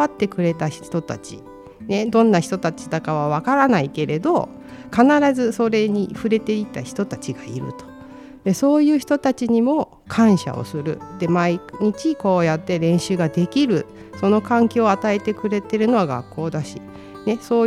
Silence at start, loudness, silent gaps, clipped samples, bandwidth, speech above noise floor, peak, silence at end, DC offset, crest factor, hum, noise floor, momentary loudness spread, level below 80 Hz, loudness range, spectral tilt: 0 s; -20 LUFS; none; under 0.1%; 13.5 kHz; 20 dB; -2 dBFS; 0 s; under 0.1%; 18 dB; none; -40 dBFS; 14 LU; -56 dBFS; 3 LU; -6.5 dB/octave